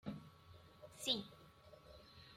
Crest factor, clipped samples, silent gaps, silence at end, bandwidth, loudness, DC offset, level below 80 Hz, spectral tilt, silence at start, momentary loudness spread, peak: 26 dB; under 0.1%; none; 0 s; 16 kHz; -43 LUFS; under 0.1%; -74 dBFS; -3 dB/octave; 0.05 s; 23 LU; -24 dBFS